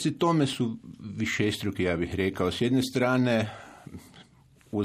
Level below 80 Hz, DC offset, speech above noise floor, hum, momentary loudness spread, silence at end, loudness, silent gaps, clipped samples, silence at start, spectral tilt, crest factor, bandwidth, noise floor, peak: -56 dBFS; under 0.1%; 31 dB; none; 20 LU; 0 s; -27 LUFS; none; under 0.1%; 0 s; -5.5 dB/octave; 16 dB; 14.5 kHz; -58 dBFS; -12 dBFS